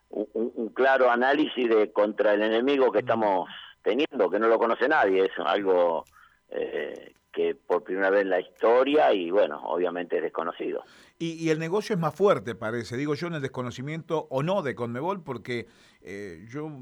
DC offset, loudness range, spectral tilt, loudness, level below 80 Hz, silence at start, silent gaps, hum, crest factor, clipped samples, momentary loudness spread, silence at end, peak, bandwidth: under 0.1%; 7 LU; -6 dB/octave; -26 LUFS; -70 dBFS; 0.15 s; none; none; 16 dB; under 0.1%; 13 LU; 0 s; -10 dBFS; 11.5 kHz